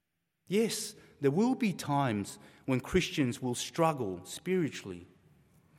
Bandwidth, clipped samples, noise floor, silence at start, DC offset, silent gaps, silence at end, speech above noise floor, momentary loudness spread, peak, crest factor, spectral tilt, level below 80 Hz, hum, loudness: 16 kHz; under 0.1%; -72 dBFS; 0.5 s; under 0.1%; none; 0.75 s; 40 dB; 13 LU; -14 dBFS; 18 dB; -5 dB/octave; -58 dBFS; none; -32 LUFS